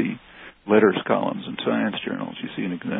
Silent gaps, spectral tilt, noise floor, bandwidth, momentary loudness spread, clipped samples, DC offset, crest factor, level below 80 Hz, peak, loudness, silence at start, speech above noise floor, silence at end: none; -10.5 dB/octave; -46 dBFS; 4 kHz; 16 LU; under 0.1%; under 0.1%; 22 dB; -62 dBFS; -2 dBFS; -23 LUFS; 0 s; 23 dB; 0 s